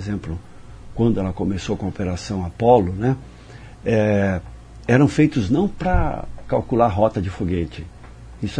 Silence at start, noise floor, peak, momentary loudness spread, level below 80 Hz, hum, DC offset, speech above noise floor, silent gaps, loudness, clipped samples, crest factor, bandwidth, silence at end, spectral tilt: 0 s; -40 dBFS; -2 dBFS; 17 LU; -34 dBFS; none; under 0.1%; 21 dB; none; -21 LUFS; under 0.1%; 20 dB; 10.5 kHz; 0 s; -7.5 dB/octave